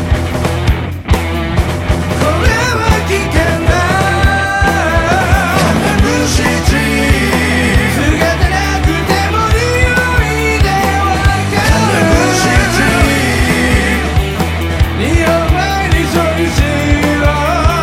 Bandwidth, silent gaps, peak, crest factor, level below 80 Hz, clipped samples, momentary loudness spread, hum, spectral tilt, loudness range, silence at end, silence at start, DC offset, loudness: 16.5 kHz; none; 0 dBFS; 12 dB; -18 dBFS; under 0.1%; 4 LU; none; -5 dB/octave; 2 LU; 0 s; 0 s; under 0.1%; -12 LUFS